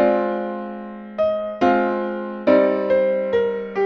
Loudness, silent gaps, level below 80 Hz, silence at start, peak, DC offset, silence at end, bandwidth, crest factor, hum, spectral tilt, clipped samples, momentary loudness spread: -20 LUFS; none; -58 dBFS; 0 s; -2 dBFS; under 0.1%; 0 s; 6.2 kHz; 18 dB; none; -7.5 dB/octave; under 0.1%; 12 LU